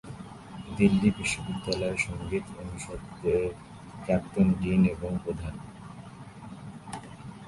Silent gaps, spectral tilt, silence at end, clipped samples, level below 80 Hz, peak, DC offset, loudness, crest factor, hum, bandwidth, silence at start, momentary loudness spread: none; -6 dB/octave; 0 s; under 0.1%; -48 dBFS; -10 dBFS; under 0.1%; -28 LUFS; 20 dB; none; 11.5 kHz; 0.05 s; 20 LU